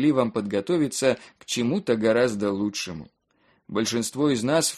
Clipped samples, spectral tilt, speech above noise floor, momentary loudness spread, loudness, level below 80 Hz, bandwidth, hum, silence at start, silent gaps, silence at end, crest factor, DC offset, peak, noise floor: under 0.1%; -4.5 dB/octave; 41 dB; 10 LU; -25 LUFS; -62 dBFS; 13 kHz; none; 0 s; none; 0 s; 18 dB; under 0.1%; -6 dBFS; -65 dBFS